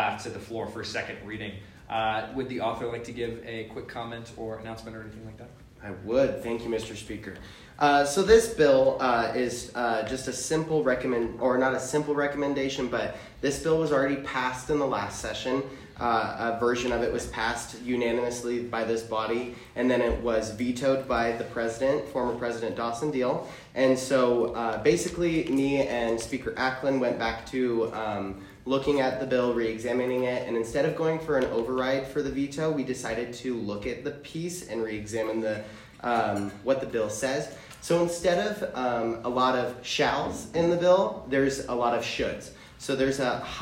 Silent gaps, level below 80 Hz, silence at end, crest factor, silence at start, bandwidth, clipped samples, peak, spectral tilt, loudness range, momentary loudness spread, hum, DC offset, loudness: none; -50 dBFS; 0 s; 20 dB; 0 s; 16 kHz; under 0.1%; -6 dBFS; -4.5 dB/octave; 8 LU; 13 LU; none; under 0.1%; -28 LUFS